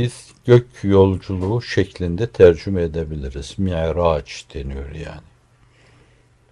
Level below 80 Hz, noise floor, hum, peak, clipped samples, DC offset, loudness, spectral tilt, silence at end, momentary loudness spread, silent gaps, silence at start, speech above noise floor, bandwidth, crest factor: -38 dBFS; -54 dBFS; none; 0 dBFS; under 0.1%; under 0.1%; -18 LUFS; -7.5 dB/octave; 1.3 s; 17 LU; none; 0 s; 36 dB; 11 kHz; 18 dB